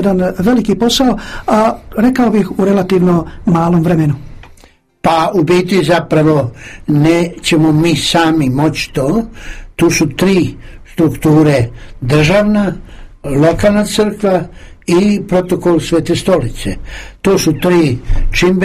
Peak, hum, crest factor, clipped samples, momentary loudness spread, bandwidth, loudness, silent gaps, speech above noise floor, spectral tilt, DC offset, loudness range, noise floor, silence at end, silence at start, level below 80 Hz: 0 dBFS; none; 12 dB; under 0.1%; 10 LU; 15.5 kHz; -12 LUFS; none; 33 dB; -6 dB/octave; under 0.1%; 2 LU; -45 dBFS; 0 s; 0 s; -26 dBFS